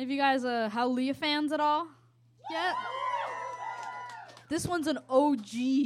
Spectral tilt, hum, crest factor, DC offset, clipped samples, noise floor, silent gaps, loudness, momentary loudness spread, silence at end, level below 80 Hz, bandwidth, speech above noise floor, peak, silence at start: -4 dB/octave; none; 18 dB; under 0.1%; under 0.1%; -59 dBFS; none; -30 LUFS; 13 LU; 0 s; -68 dBFS; 14 kHz; 30 dB; -12 dBFS; 0 s